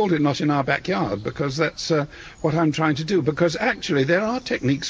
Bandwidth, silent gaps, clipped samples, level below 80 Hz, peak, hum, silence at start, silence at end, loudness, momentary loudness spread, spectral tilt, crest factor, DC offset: 8 kHz; none; under 0.1%; -50 dBFS; -6 dBFS; none; 0 s; 0 s; -22 LUFS; 5 LU; -5.5 dB/octave; 16 dB; under 0.1%